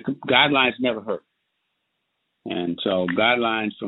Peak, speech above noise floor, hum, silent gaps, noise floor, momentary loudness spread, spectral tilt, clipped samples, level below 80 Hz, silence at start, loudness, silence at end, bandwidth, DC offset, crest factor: -2 dBFS; 54 dB; none; none; -76 dBFS; 14 LU; -8.5 dB/octave; under 0.1%; -64 dBFS; 0.05 s; -21 LUFS; 0 s; 4.1 kHz; under 0.1%; 22 dB